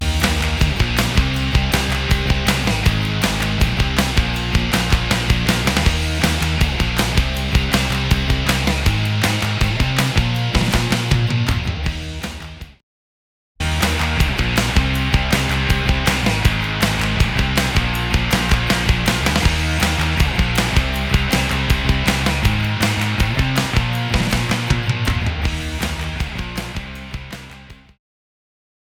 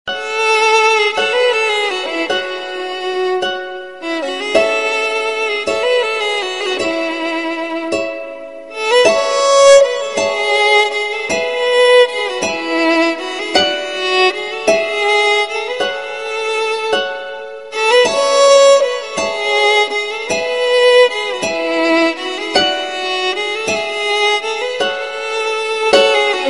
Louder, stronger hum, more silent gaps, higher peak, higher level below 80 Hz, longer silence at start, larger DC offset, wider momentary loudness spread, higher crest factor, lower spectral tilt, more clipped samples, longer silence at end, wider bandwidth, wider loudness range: second, -18 LUFS vs -14 LUFS; neither; first, 12.83-13.55 s vs none; about the same, 0 dBFS vs 0 dBFS; first, -24 dBFS vs -58 dBFS; about the same, 0 s vs 0.05 s; second, under 0.1% vs 0.5%; second, 6 LU vs 11 LU; about the same, 18 dB vs 14 dB; first, -4.5 dB/octave vs -1.5 dB/octave; neither; first, 1.25 s vs 0 s; first, 19.5 kHz vs 11.5 kHz; about the same, 5 LU vs 5 LU